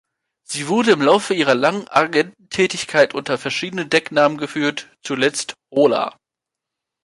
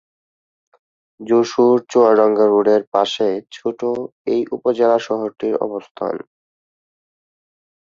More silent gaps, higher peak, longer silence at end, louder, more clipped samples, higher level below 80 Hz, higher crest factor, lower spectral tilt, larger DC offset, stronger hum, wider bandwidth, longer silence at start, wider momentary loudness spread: second, none vs 2.87-2.92 s, 4.12-4.25 s, 5.91-5.95 s; about the same, -2 dBFS vs -2 dBFS; second, 0.95 s vs 1.6 s; about the same, -18 LUFS vs -17 LUFS; neither; about the same, -64 dBFS vs -66 dBFS; about the same, 18 dB vs 16 dB; second, -4 dB/octave vs -5.5 dB/octave; neither; neither; first, 11.5 kHz vs 7.6 kHz; second, 0.5 s vs 1.2 s; second, 9 LU vs 12 LU